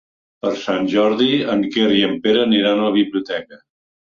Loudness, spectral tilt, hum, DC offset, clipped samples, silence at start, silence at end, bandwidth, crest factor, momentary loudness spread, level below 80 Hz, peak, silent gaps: -17 LUFS; -6 dB/octave; none; under 0.1%; under 0.1%; 0.45 s; 0.6 s; 7.2 kHz; 14 dB; 9 LU; -58 dBFS; -4 dBFS; none